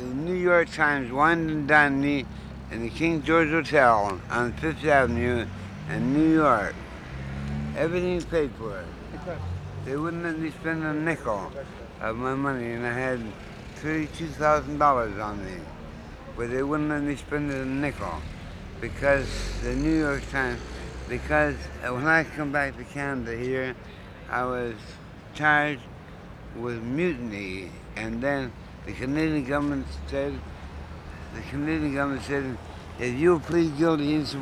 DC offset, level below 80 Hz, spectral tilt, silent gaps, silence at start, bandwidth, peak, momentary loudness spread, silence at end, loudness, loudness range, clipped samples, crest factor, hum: under 0.1%; -42 dBFS; -6.5 dB/octave; none; 0 s; 13 kHz; -4 dBFS; 18 LU; 0 s; -26 LUFS; 7 LU; under 0.1%; 22 dB; none